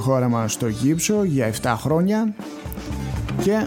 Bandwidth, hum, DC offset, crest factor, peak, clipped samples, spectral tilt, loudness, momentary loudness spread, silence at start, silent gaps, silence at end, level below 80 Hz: 17 kHz; none; under 0.1%; 16 dB; -6 dBFS; under 0.1%; -5.5 dB/octave; -22 LUFS; 11 LU; 0 s; none; 0 s; -38 dBFS